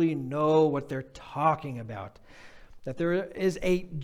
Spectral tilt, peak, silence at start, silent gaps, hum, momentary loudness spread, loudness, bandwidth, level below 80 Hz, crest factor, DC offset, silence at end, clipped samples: -7 dB/octave; -10 dBFS; 0 s; none; none; 17 LU; -28 LUFS; 15.5 kHz; -52 dBFS; 18 dB; under 0.1%; 0 s; under 0.1%